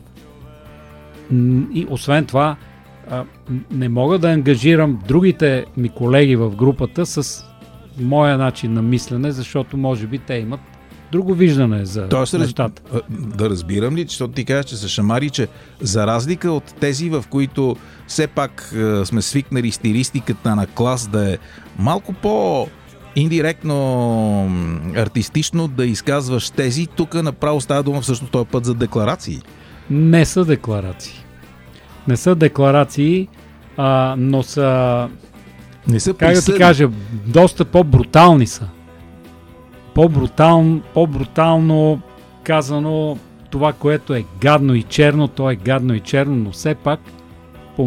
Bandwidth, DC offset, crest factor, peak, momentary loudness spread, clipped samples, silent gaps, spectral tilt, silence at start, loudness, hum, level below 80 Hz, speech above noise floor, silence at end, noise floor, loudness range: 15 kHz; under 0.1%; 16 dB; 0 dBFS; 12 LU; under 0.1%; none; -6.5 dB/octave; 0.4 s; -16 LUFS; none; -40 dBFS; 25 dB; 0 s; -41 dBFS; 6 LU